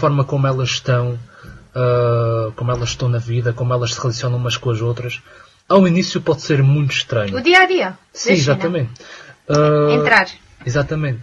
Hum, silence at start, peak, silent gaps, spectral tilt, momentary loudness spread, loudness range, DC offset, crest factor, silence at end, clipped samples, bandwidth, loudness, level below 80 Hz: none; 0 s; 0 dBFS; none; -5.5 dB/octave; 12 LU; 4 LU; under 0.1%; 16 dB; 0 s; under 0.1%; 12 kHz; -17 LUFS; -46 dBFS